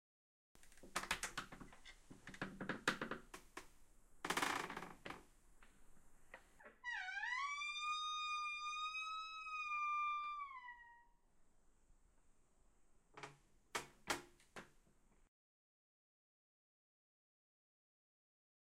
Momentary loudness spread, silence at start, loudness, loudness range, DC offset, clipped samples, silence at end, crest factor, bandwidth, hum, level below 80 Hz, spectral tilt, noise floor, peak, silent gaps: 19 LU; 0.55 s; -45 LUFS; 10 LU; under 0.1%; under 0.1%; 3.95 s; 28 dB; 16 kHz; none; -70 dBFS; -2 dB/octave; -72 dBFS; -22 dBFS; none